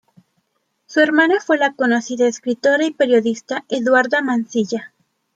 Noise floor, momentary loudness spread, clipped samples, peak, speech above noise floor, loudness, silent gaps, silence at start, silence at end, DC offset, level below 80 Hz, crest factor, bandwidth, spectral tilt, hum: -69 dBFS; 8 LU; under 0.1%; -2 dBFS; 52 dB; -17 LUFS; none; 0.9 s; 0.5 s; under 0.1%; -70 dBFS; 16 dB; 9 kHz; -4 dB/octave; none